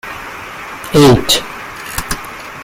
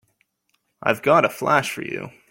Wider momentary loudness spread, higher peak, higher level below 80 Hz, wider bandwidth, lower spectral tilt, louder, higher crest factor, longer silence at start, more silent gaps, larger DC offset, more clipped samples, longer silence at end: first, 18 LU vs 13 LU; about the same, 0 dBFS vs -2 dBFS; first, -34 dBFS vs -66 dBFS; about the same, 17 kHz vs 17 kHz; about the same, -4.5 dB/octave vs -4.5 dB/octave; first, -12 LUFS vs -20 LUFS; about the same, 16 dB vs 20 dB; second, 0.05 s vs 0.8 s; neither; neither; neither; second, 0 s vs 0.2 s